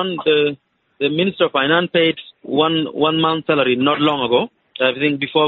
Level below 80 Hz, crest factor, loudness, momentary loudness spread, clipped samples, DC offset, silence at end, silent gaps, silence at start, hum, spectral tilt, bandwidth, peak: -62 dBFS; 14 dB; -17 LUFS; 6 LU; under 0.1%; under 0.1%; 0 s; none; 0 s; none; -2.5 dB/octave; 4.5 kHz; -2 dBFS